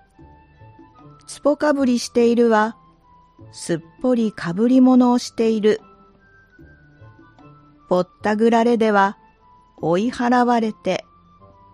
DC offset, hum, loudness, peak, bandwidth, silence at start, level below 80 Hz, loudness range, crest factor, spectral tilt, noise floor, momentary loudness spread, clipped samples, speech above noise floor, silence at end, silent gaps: under 0.1%; none; -18 LUFS; -4 dBFS; 11 kHz; 1.3 s; -58 dBFS; 4 LU; 16 dB; -5.5 dB/octave; -52 dBFS; 11 LU; under 0.1%; 35 dB; 0.75 s; none